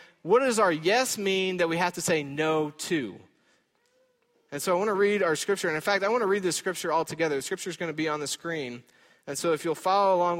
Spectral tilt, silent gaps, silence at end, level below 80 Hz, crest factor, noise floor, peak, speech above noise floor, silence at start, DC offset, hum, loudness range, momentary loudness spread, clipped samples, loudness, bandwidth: -3.5 dB/octave; none; 0 s; -72 dBFS; 16 dB; -68 dBFS; -10 dBFS; 42 dB; 0 s; under 0.1%; none; 4 LU; 10 LU; under 0.1%; -26 LUFS; 16.5 kHz